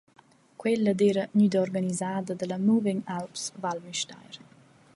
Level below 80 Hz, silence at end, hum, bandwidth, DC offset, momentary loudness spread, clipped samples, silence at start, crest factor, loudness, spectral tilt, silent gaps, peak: -72 dBFS; 0.6 s; none; 11.5 kHz; under 0.1%; 11 LU; under 0.1%; 0.6 s; 16 dB; -27 LUFS; -5.5 dB/octave; none; -12 dBFS